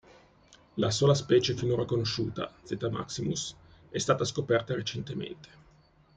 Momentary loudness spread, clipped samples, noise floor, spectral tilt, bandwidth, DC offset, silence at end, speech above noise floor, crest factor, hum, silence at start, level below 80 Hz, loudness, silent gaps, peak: 14 LU; under 0.1%; -61 dBFS; -5 dB/octave; 9.4 kHz; under 0.1%; 0.7 s; 32 dB; 20 dB; none; 0.75 s; -60 dBFS; -30 LUFS; none; -10 dBFS